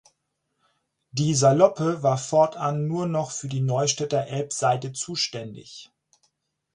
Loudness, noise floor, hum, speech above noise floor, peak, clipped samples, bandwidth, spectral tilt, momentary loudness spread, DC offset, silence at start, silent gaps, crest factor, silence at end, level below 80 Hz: -23 LUFS; -77 dBFS; none; 53 dB; -4 dBFS; under 0.1%; 11 kHz; -5 dB/octave; 15 LU; under 0.1%; 1.15 s; none; 22 dB; 0.9 s; -64 dBFS